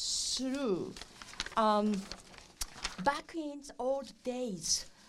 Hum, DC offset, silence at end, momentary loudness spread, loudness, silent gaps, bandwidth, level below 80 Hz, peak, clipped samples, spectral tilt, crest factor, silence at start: none; under 0.1%; 0 s; 15 LU; -35 LUFS; none; 16 kHz; -58 dBFS; -14 dBFS; under 0.1%; -3 dB/octave; 20 dB; 0 s